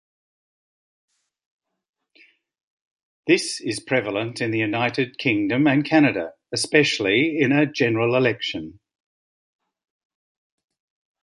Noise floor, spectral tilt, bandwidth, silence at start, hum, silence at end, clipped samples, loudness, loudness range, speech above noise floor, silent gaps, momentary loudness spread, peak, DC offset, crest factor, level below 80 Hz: -57 dBFS; -5 dB/octave; 11.5 kHz; 3.25 s; none; 2.5 s; under 0.1%; -21 LUFS; 9 LU; 36 dB; none; 10 LU; -2 dBFS; under 0.1%; 22 dB; -64 dBFS